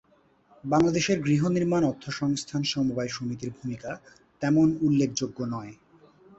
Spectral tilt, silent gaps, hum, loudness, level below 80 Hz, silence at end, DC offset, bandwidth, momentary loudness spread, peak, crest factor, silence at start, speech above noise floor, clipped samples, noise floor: -5.5 dB/octave; none; none; -26 LUFS; -58 dBFS; 0.65 s; under 0.1%; 8.2 kHz; 14 LU; -10 dBFS; 16 dB; 0.65 s; 36 dB; under 0.1%; -62 dBFS